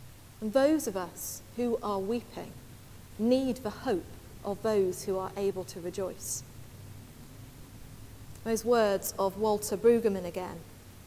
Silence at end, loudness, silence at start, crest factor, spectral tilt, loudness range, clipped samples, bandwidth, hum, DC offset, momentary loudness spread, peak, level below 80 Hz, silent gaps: 0 s; -31 LUFS; 0 s; 18 dB; -5 dB/octave; 8 LU; under 0.1%; 16 kHz; none; under 0.1%; 23 LU; -14 dBFS; -56 dBFS; none